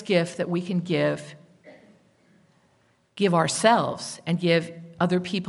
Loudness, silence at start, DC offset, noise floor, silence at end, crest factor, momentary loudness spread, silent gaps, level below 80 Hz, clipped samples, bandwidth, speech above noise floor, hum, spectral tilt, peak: -24 LUFS; 0 s; under 0.1%; -64 dBFS; 0 s; 22 dB; 11 LU; none; -70 dBFS; under 0.1%; 11.5 kHz; 41 dB; none; -5 dB/octave; -4 dBFS